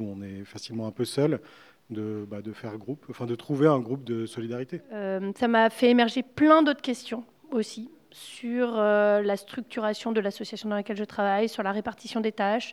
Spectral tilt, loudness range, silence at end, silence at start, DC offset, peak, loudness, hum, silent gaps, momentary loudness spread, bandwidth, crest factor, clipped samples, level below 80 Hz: -6 dB/octave; 6 LU; 0 s; 0 s; under 0.1%; -6 dBFS; -27 LUFS; none; none; 17 LU; 14 kHz; 22 dB; under 0.1%; -72 dBFS